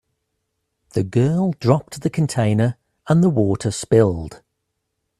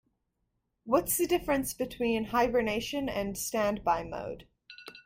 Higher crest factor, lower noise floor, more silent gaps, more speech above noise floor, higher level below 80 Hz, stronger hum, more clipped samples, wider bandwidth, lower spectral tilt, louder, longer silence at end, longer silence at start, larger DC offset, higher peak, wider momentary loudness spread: about the same, 20 dB vs 20 dB; second, -75 dBFS vs -80 dBFS; neither; first, 58 dB vs 50 dB; about the same, -50 dBFS vs -54 dBFS; neither; neither; second, 13 kHz vs 16.5 kHz; first, -7 dB/octave vs -3.5 dB/octave; first, -19 LUFS vs -30 LUFS; first, 0.85 s vs 0.05 s; about the same, 0.95 s vs 0.85 s; neither; first, 0 dBFS vs -12 dBFS; about the same, 10 LU vs 12 LU